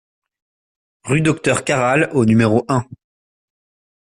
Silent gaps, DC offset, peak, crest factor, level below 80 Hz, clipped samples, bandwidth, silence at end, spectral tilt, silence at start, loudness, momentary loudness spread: none; under 0.1%; -2 dBFS; 16 dB; -52 dBFS; under 0.1%; 11.5 kHz; 1.2 s; -6 dB/octave; 1.05 s; -16 LUFS; 7 LU